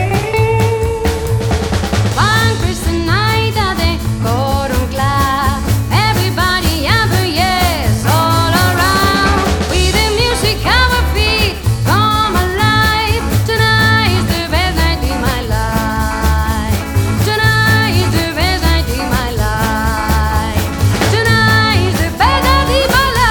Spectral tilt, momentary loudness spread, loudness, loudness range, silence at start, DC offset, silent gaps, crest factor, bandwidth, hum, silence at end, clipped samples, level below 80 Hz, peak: -4.5 dB/octave; 5 LU; -13 LUFS; 2 LU; 0 s; under 0.1%; none; 12 dB; over 20 kHz; none; 0 s; under 0.1%; -20 dBFS; 0 dBFS